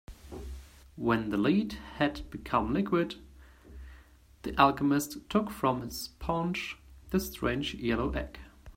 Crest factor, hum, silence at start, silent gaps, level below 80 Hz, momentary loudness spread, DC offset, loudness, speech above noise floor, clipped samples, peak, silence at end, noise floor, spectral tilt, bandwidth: 26 dB; none; 0.1 s; none; -48 dBFS; 19 LU; under 0.1%; -31 LUFS; 26 dB; under 0.1%; -6 dBFS; 0.05 s; -56 dBFS; -5.5 dB/octave; 16 kHz